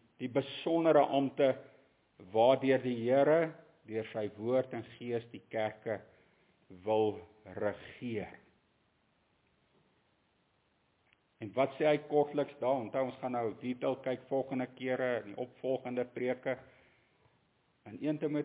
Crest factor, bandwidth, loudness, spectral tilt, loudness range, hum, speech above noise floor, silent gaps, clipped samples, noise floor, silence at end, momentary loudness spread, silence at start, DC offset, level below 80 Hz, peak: 20 dB; 4 kHz; -34 LUFS; -5 dB/octave; 9 LU; none; 41 dB; none; under 0.1%; -74 dBFS; 0 s; 14 LU; 0.2 s; under 0.1%; -76 dBFS; -14 dBFS